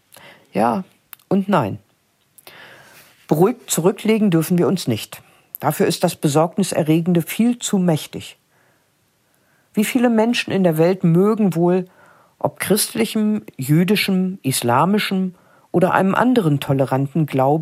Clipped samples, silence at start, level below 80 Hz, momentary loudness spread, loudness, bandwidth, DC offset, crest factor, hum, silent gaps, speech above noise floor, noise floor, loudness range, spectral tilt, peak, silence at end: under 0.1%; 0.55 s; -64 dBFS; 10 LU; -18 LUFS; 16 kHz; under 0.1%; 18 dB; none; none; 45 dB; -62 dBFS; 4 LU; -5.5 dB/octave; 0 dBFS; 0 s